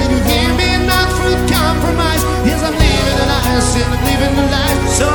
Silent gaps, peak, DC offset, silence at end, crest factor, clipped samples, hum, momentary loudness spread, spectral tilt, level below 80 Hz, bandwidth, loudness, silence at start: none; 0 dBFS; under 0.1%; 0 s; 12 dB; under 0.1%; none; 2 LU; -4.5 dB/octave; -20 dBFS; 17.5 kHz; -13 LUFS; 0 s